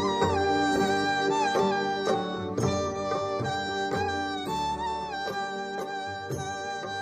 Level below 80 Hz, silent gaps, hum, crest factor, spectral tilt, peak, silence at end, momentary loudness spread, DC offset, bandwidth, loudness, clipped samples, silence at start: -50 dBFS; none; none; 16 dB; -4.5 dB/octave; -12 dBFS; 0 s; 9 LU; under 0.1%; 15 kHz; -28 LUFS; under 0.1%; 0 s